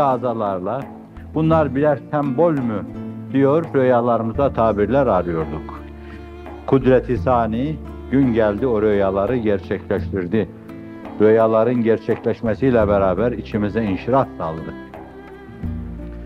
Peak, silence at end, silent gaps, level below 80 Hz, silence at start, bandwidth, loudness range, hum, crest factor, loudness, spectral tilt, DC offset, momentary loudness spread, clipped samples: -2 dBFS; 0 s; none; -40 dBFS; 0 s; 6.6 kHz; 2 LU; none; 16 dB; -19 LUFS; -9.5 dB/octave; under 0.1%; 19 LU; under 0.1%